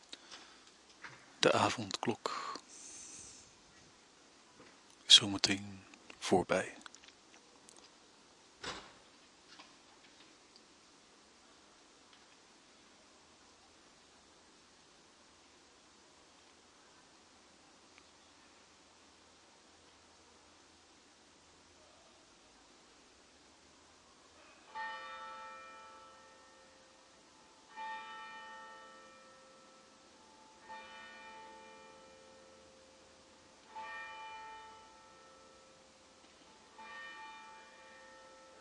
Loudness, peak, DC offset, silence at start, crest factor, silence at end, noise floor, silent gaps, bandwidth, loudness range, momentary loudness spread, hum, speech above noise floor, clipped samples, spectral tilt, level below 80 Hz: -34 LUFS; -8 dBFS; under 0.1%; 0.1 s; 34 dB; 0 s; -64 dBFS; none; 11.5 kHz; 30 LU; 27 LU; none; 30 dB; under 0.1%; -2 dB/octave; -78 dBFS